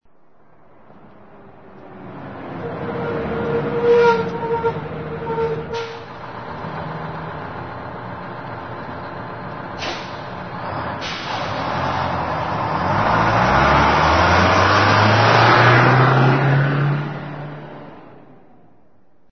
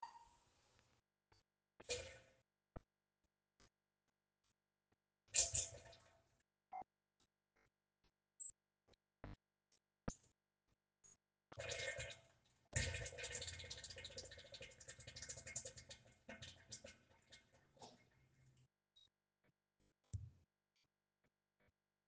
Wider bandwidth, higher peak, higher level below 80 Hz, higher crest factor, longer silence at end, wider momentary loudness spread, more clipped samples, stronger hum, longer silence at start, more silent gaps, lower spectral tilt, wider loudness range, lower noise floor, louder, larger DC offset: second, 6.4 kHz vs 10 kHz; first, 0 dBFS vs -22 dBFS; first, -40 dBFS vs -70 dBFS; second, 18 dB vs 34 dB; second, 1.15 s vs 1.7 s; about the same, 18 LU vs 20 LU; neither; neither; first, 1.35 s vs 0 s; neither; first, -6.5 dB/octave vs -1.5 dB/octave; about the same, 16 LU vs 17 LU; second, -58 dBFS vs under -90 dBFS; first, -17 LUFS vs -49 LUFS; first, 0.5% vs under 0.1%